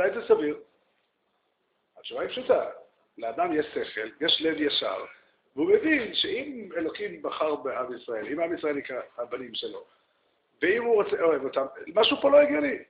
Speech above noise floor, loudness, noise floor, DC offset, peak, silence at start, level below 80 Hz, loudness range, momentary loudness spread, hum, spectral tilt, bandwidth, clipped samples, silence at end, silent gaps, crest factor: 48 dB; -27 LUFS; -74 dBFS; under 0.1%; -8 dBFS; 0 s; -68 dBFS; 6 LU; 14 LU; none; -1 dB/octave; 5.2 kHz; under 0.1%; 0.05 s; none; 20 dB